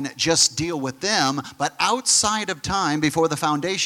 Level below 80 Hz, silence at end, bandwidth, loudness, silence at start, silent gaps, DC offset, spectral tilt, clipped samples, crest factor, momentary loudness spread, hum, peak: -52 dBFS; 0 s; 17 kHz; -20 LUFS; 0 s; none; under 0.1%; -2.5 dB/octave; under 0.1%; 18 dB; 9 LU; none; -4 dBFS